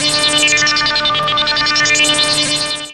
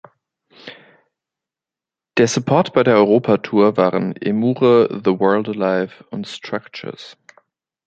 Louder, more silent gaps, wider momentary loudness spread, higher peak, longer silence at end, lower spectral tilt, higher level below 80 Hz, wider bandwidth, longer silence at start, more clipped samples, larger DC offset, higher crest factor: first, -11 LUFS vs -17 LUFS; neither; second, 3 LU vs 18 LU; about the same, 0 dBFS vs -2 dBFS; second, 0 s vs 0.75 s; second, -0.5 dB/octave vs -6 dB/octave; first, -44 dBFS vs -62 dBFS; first, 14 kHz vs 9 kHz; second, 0 s vs 0.65 s; neither; first, 0.4% vs under 0.1%; about the same, 14 dB vs 16 dB